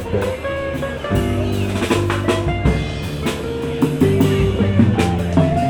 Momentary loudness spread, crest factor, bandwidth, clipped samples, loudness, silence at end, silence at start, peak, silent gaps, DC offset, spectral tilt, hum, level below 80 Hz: 8 LU; 16 dB; 19.5 kHz; under 0.1%; -18 LUFS; 0 s; 0 s; -2 dBFS; none; under 0.1%; -7 dB/octave; none; -30 dBFS